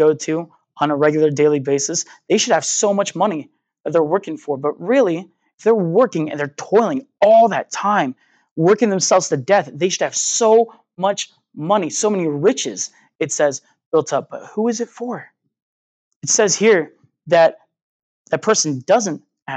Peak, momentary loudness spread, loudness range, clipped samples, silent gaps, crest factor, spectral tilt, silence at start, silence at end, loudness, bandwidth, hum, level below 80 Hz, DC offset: -2 dBFS; 12 LU; 4 LU; under 0.1%; 3.80-3.84 s, 5.54-5.58 s, 8.51-8.56 s, 13.15-13.19 s, 13.86-13.92 s, 15.62-16.21 s, 17.82-18.25 s, 19.42-19.46 s; 16 dB; -3.5 dB/octave; 0 s; 0 s; -17 LUFS; 9.4 kHz; none; -78 dBFS; under 0.1%